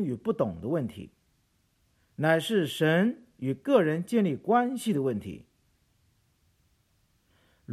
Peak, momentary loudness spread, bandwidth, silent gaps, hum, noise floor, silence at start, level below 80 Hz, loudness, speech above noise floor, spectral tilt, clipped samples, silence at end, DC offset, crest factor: -10 dBFS; 13 LU; 15 kHz; none; none; -70 dBFS; 0 s; -66 dBFS; -27 LUFS; 43 dB; -6.5 dB/octave; under 0.1%; 0 s; under 0.1%; 20 dB